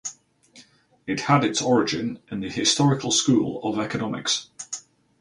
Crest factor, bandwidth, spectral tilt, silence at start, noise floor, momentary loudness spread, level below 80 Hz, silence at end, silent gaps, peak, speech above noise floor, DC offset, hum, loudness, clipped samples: 20 dB; 11.5 kHz; -4 dB/octave; 0.05 s; -54 dBFS; 15 LU; -60 dBFS; 0.4 s; none; -6 dBFS; 31 dB; under 0.1%; none; -23 LUFS; under 0.1%